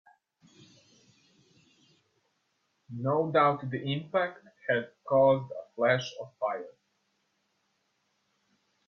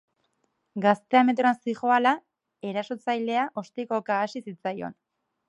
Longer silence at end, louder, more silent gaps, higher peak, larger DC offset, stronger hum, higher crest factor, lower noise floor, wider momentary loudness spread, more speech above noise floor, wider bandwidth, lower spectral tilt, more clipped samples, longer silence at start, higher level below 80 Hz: first, 2.15 s vs 0.55 s; second, -29 LUFS vs -26 LUFS; neither; second, -10 dBFS vs -6 dBFS; neither; neither; about the same, 22 dB vs 22 dB; about the same, -76 dBFS vs -74 dBFS; first, 16 LU vs 13 LU; about the same, 48 dB vs 49 dB; second, 7 kHz vs 8.8 kHz; about the same, -6.5 dB/octave vs -6 dB/octave; neither; first, 2.9 s vs 0.75 s; first, -74 dBFS vs -80 dBFS